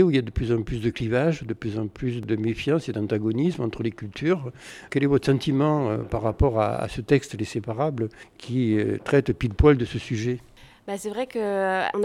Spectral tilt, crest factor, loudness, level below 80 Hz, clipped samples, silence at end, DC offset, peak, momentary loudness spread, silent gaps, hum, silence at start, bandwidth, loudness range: -7 dB/octave; 18 dB; -25 LUFS; -38 dBFS; under 0.1%; 0 s; under 0.1%; -6 dBFS; 9 LU; none; none; 0 s; 12.5 kHz; 2 LU